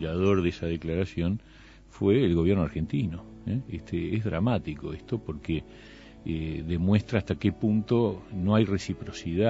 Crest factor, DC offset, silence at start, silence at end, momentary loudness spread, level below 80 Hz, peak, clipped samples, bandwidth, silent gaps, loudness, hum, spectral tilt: 20 dB; under 0.1%; 0 s; 0 s; 11 LU; -46 dBFS; -8 dBFS; under 0.1%; 8 kHz; none; -28 LUFS; none; -8 dB/octave